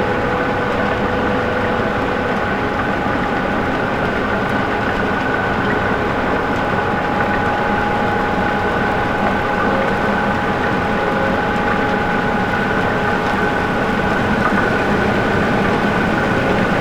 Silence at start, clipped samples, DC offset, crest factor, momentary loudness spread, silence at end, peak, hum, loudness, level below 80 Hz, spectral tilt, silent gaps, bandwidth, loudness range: 0 s; under 0.1%; under 0.1%; 14 dB; 2 LU; 0 s; -4 dBFS; none; -17 LUFS; -34 dBFS; -6.5 dB/octave; none; 18.5 kHz; 2 LU